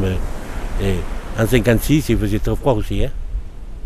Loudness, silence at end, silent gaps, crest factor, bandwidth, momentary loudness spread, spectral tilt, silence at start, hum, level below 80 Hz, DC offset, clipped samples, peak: -20 LUFS; 0 s; none; 16 dB; 15.5 kHz; 15 LU; -6.5 dB/octave; 0 s; none; -24 dBFS; under 0.1%; under 0.1%; -2 dBFS